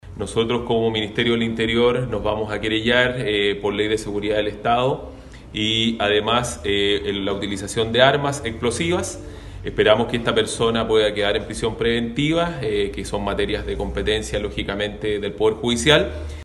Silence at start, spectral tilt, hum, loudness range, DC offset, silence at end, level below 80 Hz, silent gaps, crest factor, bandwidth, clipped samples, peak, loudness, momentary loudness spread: 0.05 s; -4.5 dB/octave; none; 3 LU; under 0.1%; 0 s; -38 dBFS; none; 20 dB; 12.5 kHz; under 0.1%; 0 dBFS; -21 LUFS; 9 LU